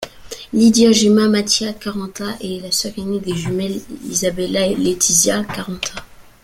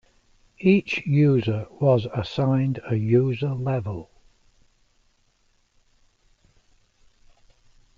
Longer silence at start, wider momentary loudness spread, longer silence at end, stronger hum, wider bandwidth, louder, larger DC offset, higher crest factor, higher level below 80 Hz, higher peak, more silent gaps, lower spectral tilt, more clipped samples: second, 0 s vs 0.6 s; first, 14 LU vs 9 LU; second, 0.2 s vs 3.95 s; neither; first, 16 kHz vs 7.2 kHz; first, -17 LUFS vs -23 LUFS; neither; about the same, 16 dB vs 20 dB; first, -46 dBFS vs -56 dBFS; first, 0 dBFS vs -6 dBFS; neither; second, -3.5 dB/octave vs -8.5 dB/octave; neither